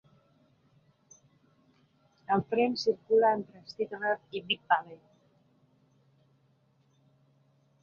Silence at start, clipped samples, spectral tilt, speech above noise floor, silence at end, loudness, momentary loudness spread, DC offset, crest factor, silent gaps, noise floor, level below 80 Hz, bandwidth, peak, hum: 2.3 s; under 0.1%; -5 dB/octave; 39 dB; 2.85 s; -29 LUFS; 13 LU; under 0.1%; 22 dB; none; -68 dBFS; -74 dBFS; 7 kHz; -12 dBFS; none